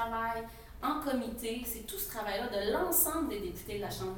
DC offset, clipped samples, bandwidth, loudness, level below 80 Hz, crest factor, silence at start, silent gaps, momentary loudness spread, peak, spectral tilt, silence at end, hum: under 0.1%; under 0.1%; 19 kHz; -34 LUFS; -52 dBFS; 20 dB; 0 s; none; 12 LU; -14 dBFS; -3 dB/octave; 0 s; none